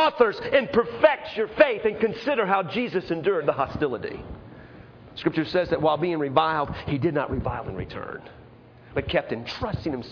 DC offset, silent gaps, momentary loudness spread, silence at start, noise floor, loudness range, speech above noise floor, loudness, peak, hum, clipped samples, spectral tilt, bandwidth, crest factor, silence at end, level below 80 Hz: under 0.1%; none; 14 LU; 0 s; -49 dBFS; 5 LU; 24 dB; -25 LUFS; -6 dBFS; none; under 0.1%; -7.5 dB/octave; 5.4 kHz; 20 dB; 0 s; -48 dBFS